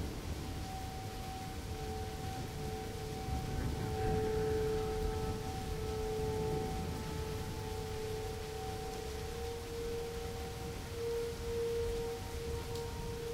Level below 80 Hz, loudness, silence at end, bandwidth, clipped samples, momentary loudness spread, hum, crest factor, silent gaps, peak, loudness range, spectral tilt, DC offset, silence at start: -46 dBFS; -40 LUFS; 0 s; 16 kHz; under 0.1%; 7 LU; none; 18 dB; none; -22 dBFS; 4 LU; -5.5 dB/octave; under 0.1%; 0 s